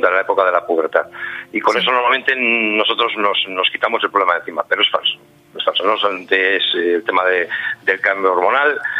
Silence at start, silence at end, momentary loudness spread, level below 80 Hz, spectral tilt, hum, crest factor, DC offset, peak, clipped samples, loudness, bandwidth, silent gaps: 0 s; 0 s; 6 LU; -68 dBFS; -3.5 dB/octave; none; 16 dB; under 0.1%; 0 dBFS; under 0.1%; -16 LUFS; 12 kHz; none